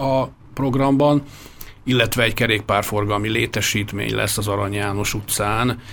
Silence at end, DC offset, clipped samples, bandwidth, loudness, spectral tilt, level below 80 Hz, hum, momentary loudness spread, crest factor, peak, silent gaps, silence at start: 0 s; under 0.1%; under 0.1%; over 20 kHz; -20 LUFS; -4.5 dB/octave; -40 dBFS; none; 8 LU; 18 dB; -2 dBFS; none; 0 s